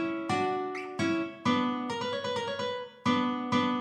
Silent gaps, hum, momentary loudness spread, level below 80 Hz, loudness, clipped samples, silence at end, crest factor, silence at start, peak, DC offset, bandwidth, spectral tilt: none; none; 5 LU; -74 dBFS; -31 LUFS; under 0.1%; 0 s; 16 dB; 0 s; -14 dBFS; under 0.1%; 10 kHz; -5 dB/octave